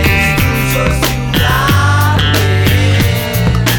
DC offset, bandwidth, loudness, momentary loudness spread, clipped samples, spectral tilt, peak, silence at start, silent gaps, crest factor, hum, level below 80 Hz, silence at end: under 0.1%; over 20 kHz; -11 LUFS; 3 LU; under 0.1%; -5 dB/octave; 0 dBFS; 0 s; none; 10 dB; none; -22 dBFS; 0 s